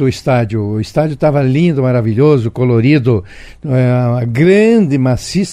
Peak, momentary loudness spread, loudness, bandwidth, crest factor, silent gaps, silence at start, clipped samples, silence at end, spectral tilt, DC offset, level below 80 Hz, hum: 0 dBFS; 7 LU; -12 LUFS; 10.5 kHz; 12 dB; none; 0 s; under 0.1%; 0 s; -7.5 dB/octave; under 0.1%; -40 dBFS; none